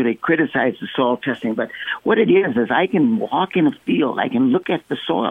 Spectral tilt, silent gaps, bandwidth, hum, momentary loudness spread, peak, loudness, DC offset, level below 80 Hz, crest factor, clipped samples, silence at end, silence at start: -8 dB/octave; none; 3.9 kHz; none; 7 LU; -4 dBFS; -19 LUFS; under 0.1%; -62 dBFS; 14 dB; under 0.1%; 0 s; 0 s